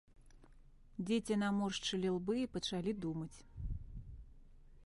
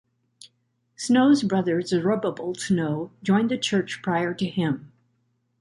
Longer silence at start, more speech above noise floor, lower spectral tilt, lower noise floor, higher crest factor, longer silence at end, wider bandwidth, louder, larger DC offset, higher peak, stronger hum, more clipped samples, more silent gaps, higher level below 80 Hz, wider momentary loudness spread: second, 0.2 s vs 0.45 s; second, 23 dB vs 48 dB; about the same, -5.5 dB/octave vs -5.5 dB/octave; second, -61 dBFS vs -70 dBFS; about the same, 16 dB vs 16 dB; second, 0 s vs 0.75 s; about the same, 11.5 kHz vs 11.5 kHz; second, -39 LUFS vs -24 LUFS; neither; second, -24 dBFS vs -8 dBFS; neither; neither; neither; first, -54 dBFS vs -66 dBFS; first, 17 LU vs 9 LU